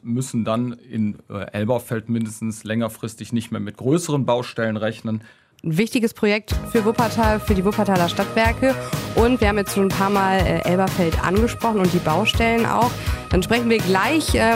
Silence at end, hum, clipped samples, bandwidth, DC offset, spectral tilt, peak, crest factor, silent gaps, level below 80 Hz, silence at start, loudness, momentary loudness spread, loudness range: 0 s; none; under 0.1%; 16 kHz; under 0.1%; -5.5 dB/octave; -4 dBFS; 16 dB; none; -34 dBFS; 0.05 s; -20 LUFS; 9 LU; 6 LU